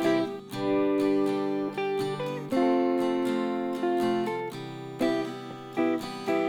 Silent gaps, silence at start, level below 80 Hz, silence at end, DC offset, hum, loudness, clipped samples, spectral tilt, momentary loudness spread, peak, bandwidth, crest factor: none; 0 s; -70 dBFS; 0 s; under 0.1%; none; -28 LUFS; under 0.1%; -6 dB/octave; 9 LU; -12 dBFS; 17.5 kHz; 14 dB